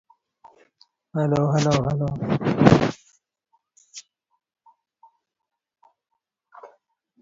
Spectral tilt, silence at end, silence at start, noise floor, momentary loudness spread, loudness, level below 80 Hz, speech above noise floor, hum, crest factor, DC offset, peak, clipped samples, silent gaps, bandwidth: -7 dB/octave; 0.55 s; 1.15 s; -84 dBFS; 26 LU; -21 LUFS; -50 dBFS; 64 dB; none; 26 dB; under 0.1%; 0 dBFS; under 0.1%; none; 7.8 kHz